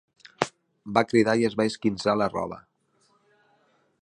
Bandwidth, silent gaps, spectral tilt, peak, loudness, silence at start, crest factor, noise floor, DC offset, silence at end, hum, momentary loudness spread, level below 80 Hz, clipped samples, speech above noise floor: 11.5 kHz; none; -5.5 dB/octave; -2 dBFS; -25 LUFS; 0.4 s; 26 dB; -67 dBFS; under 0.1%; 1.45 s; none; 13 LU; -62 dBFS; under 0.1%; 43 dB